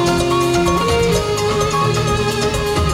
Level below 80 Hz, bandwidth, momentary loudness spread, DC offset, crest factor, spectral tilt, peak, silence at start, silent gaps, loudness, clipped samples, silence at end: -28 dBFS; 16 kHz; 2 LU; under 0.1%; 12 dB; -5 dB/octave; -4 dBFS; 0 s; none; -16 LUFS; under 0.1%; 0 s